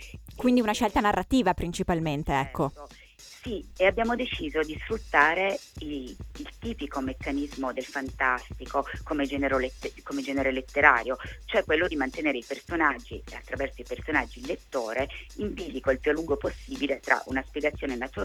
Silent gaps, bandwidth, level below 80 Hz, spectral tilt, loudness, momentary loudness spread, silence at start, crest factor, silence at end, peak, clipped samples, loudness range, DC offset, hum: none; 18.5 kHz; -44 dBFS; -5 dB/octave; -28 LUFS; 13 LU; 0 s; 26 dB; 0 s; -2 dBFS; under 0.1%; 5 LU; under 0.1%; none